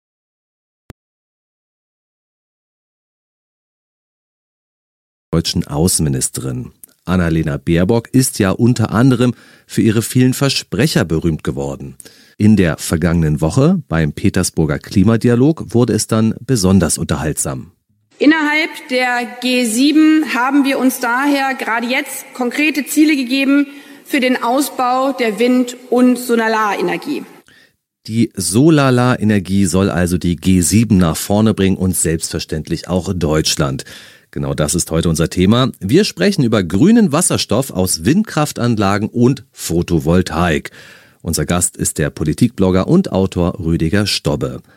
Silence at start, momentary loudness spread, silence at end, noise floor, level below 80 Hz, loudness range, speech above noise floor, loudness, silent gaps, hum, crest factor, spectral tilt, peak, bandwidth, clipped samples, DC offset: 5.3 s; 8 LU; 0.15 s; -53 dBFS; -38 dBFS; 3 LU; 38 dB; -15 LUFS; none; none; 14 dB; -5 dB/octave; 0 dBFS; 16.5 kHz; under 0.1%; under 0.1%